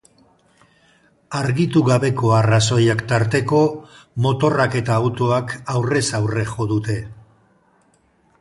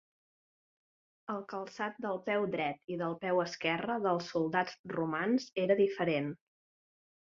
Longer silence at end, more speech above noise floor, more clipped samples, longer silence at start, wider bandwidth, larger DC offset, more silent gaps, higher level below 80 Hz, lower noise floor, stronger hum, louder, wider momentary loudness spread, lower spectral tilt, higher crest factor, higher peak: first, 1.25 s vs 0.95 s; second, 41 dB vs over 57 dB; neither; about the same, 1.3 s vs 1.3 s; first, 11.5 kHz vs 7.4 kHz; neither; second, none vs 2.84-2.88 s, 4.79-4.84 s; first, -50 dBFS vs -76 dBFS; second, -59 dBFS vs under -90 dBFS; neither; first, -19 LUFS vs -34 LUFS; second, 8 LU vs 11 LU; first, -6 dB/octave vs -4 dB/octave; about the same, 16 dB vs 20 dB; first, -2 dBFS vs -14 dBFS